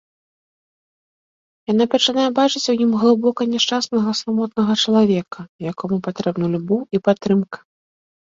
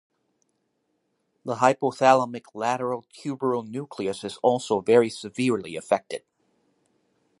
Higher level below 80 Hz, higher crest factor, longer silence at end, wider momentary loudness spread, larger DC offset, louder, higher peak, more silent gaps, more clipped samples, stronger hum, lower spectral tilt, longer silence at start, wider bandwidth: first, -62 dBFS vs -70 dBFS; about the same, 18 dB vs 22 dB; second, 0.8 s vs 1.2 s; second, 11 LU vs 14 LU; neither; first, -18 LUFS vs -25 LUFS; about the same, -2 dBFS vs -2 dBFS; first, 5.49-5.59 s vs none; neither; neither; about the same, -5 dB/octave vs -5 dB/octave; first, 1.7 s vs 1.45 s; second, 7.8 kHz vs 11.5 kHz